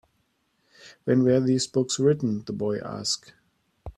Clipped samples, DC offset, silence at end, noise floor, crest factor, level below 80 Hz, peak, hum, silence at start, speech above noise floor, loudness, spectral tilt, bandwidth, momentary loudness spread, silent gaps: under 0.1%; under 0.1%; 0.05 s; -71 dBFS; 16 dB; -56 dBFS; -10 dBFS; none; 0.85 s; 47 dB; -25 LUFS; -5.5 dB/octave; 12 kHz; 9 LU; none